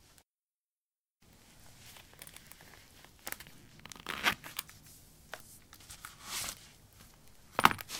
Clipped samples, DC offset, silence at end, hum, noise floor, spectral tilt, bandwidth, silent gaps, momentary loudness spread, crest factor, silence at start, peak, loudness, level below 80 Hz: under 0.1%; under 0.1%; 0 s; none; under -90 dBFS; -2 dB/octave; 18 kHz; none; 24 LU; 40 dB; 1.55 s; -2 dBFS; -36 LUFS; -64 dBFS